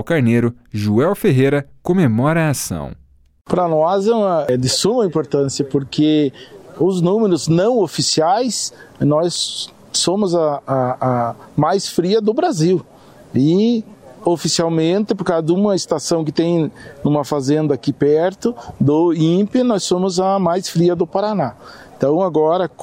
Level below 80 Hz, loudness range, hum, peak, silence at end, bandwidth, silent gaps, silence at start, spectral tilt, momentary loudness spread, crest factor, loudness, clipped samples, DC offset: -52 dBFS; 1 LU; none; 0 dBFS; 0 s; 16 kHz; 3.41-3.45 s; 0 s; -5.5 dB/octave; 7 LU; 16 dB; -17 LUFS; under 0.1%; under 0.1%